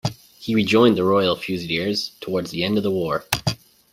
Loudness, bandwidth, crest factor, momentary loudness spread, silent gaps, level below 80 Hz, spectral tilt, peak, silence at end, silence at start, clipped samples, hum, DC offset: -21 LUFS; 16 kHz; 20 dB; 11 LU; none; -52 dBFS; -5 dB/octave; -2 dBFS; 0.4 s; 0.05 s; under 0.1%; none; under 0.1%